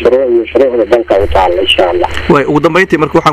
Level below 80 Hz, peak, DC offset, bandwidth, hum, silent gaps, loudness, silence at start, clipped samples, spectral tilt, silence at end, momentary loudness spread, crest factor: -28 dBFS; 0 dBFS; under 0.1%; 15 kHz; none; none; -9 LUFS; 0 s; 0.7%; -5.5 dB/octave; 0 s; 2 LU; 8 dB